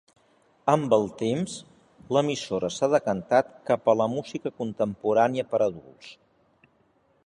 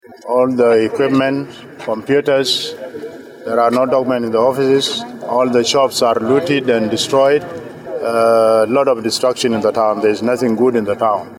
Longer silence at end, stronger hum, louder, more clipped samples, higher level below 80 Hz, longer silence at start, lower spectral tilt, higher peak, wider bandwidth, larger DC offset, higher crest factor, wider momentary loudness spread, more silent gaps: first, 1.15 s vs 0.05 s; neither; second, -26 LUFS vs -15 LUFS; neither; about the same, -64 dBFS vs -60 dBFS; first, 0.65 s vs 0.1 s; about the same, -5.5 dB/octave vs -4.5 dB/octave; second, -6 dBFS vs -2 dBFS; second, 11 kHz vs 16.5 kHz; neither; first, 20 dB vs 12 dB; about the same, 11 LU vs 11 LU; neither